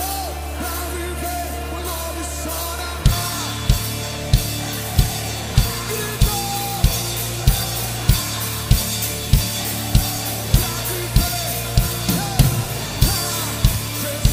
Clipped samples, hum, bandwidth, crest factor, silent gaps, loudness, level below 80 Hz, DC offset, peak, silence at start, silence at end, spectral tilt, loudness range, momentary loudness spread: under 0.1%; none; 16 kHz; 20 dB; none; -21 LUFS; -24 dBFS; under 0.1%; 0 dBFS; 0 s; 0 s; -4 dB/octave; 3 LU; 7 LU